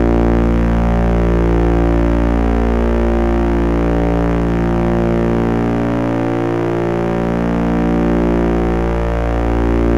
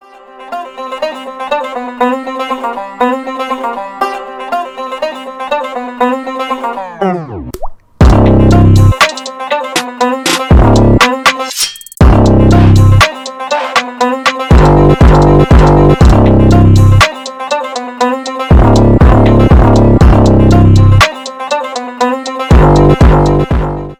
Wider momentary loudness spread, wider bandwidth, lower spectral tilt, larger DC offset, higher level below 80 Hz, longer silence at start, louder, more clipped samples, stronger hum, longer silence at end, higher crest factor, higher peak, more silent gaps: second, 3 LU vs 14 LU; second, 7.4 kHz vs 15.5 kHz; first, -9 dB/octave vs -6.5 dB/octave; first, 2% vs under 0.1%; about the same, -18 dBFS vs -14 dBFS; second, 0 s vs 0.4 s; second, -15 LUFS vs -9 LUFS; second, under 0.1% vs 1%; neither; about the same, 0 s vs 0.05 s; about the same, 10 dB vs 8 dB; about the same, -2 dBFS vs 0 dBFS; neither